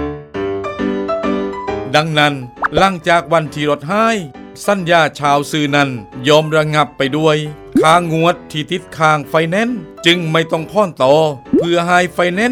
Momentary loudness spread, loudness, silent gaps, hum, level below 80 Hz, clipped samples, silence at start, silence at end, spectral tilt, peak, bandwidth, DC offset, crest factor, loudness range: 9 LU; -15 LUFS; none; none; -44 dBFS; under 0.1%; 0 s; 0 s; -5 dB/octave; 0 dBFS; 16.5 kHz; under 0.1%; 14 dB; 2 LU